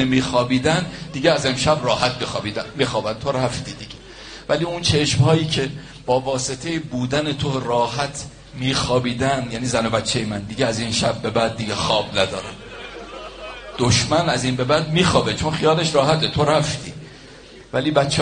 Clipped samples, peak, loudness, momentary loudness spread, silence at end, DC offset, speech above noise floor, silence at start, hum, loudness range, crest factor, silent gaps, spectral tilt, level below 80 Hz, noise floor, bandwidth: under 0.1%; -2 dBFS; -20 LUFS; 17 LU; 0 s; under 0.1%; 22 dB; 0 s; none; 4 LU; 20 dB; none; -4.5 dB/octave; -44 dBFS; -42 dBFS; 10 kHz